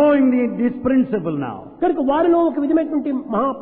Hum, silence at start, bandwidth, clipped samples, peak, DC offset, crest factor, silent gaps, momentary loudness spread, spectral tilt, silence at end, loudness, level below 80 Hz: none; 0 s; 4 kHz; under 0.1%; -6 dBFS; under 0.1%; 12 dB; none; 7 LU; -11.5 dB/octave; 0 s; -19 LUFS; -50 dBFS